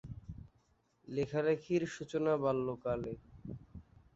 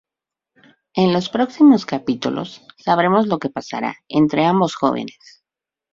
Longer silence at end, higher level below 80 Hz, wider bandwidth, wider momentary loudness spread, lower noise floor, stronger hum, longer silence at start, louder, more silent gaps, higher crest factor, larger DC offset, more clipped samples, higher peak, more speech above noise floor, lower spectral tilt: second, 0.35 s vs 0.8 s; about the same, -60 dBFS vs -60 dBFS; about the same, 8 kHz vs 7.6 kHz; first, 19 LU vs 14 LU; second, -73 dBFS vs -88 dBFS; neither; second, 0.05 s vs 0.95 s; second, -36 LUFS vs -18 LUFS; neither; about the same, 18 dB vs 16 dB; neither; neither; second, -20 dBFS vs -2 dBFS; second, 38 dB vs 70 dB; about the same, -6.5 dB/octave vs -6.5 dB/octave